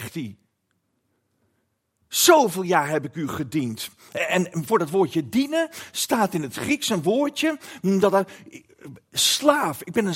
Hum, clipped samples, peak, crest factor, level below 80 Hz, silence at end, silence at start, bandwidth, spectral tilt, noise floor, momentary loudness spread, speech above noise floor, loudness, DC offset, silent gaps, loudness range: none; under 0.1%; -2 dBFS; 22 dB; -68 dBFS; 0 s; 0 s; 16.5 kHz; -3.5 dB/octave; -73 dBFS; 12 LU; 50 dB; -22 LUFS; under 0.1%; none; 2 LU